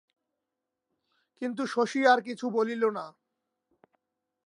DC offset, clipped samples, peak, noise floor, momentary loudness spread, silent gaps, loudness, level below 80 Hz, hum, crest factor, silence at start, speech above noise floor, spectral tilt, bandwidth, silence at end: under 0.1%; under 0.1%; -10 dBFS; -86 dBFS; 14 LU; none; -28 LUFS; -86 dBFS; none; 22 dB; 1.4 s; 59 dB; -4.5 dB/octave; 11 kHz; 1.35 s